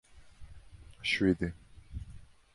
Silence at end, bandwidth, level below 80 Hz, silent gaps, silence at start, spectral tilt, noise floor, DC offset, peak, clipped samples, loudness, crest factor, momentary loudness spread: 0.3 s; 11.5 kHz; -50 dBFS; none; 0.15 s; -5.5 dB/octave; -52 dBFS; under 0.1%; -14 dBFS; under 0.1%; -31 LUFS; 22 dB; 25 LU